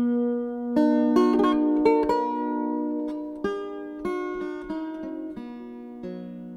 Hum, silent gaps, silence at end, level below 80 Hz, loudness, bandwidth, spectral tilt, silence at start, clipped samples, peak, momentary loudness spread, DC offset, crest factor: none; none; 0 s; -56 dBFS; -25 LUFS; 7.8 kHz; -7 dB/octave; 0 s; under 0.1%; -8 dBFS; 17 LU; under 0.1%; 16 dB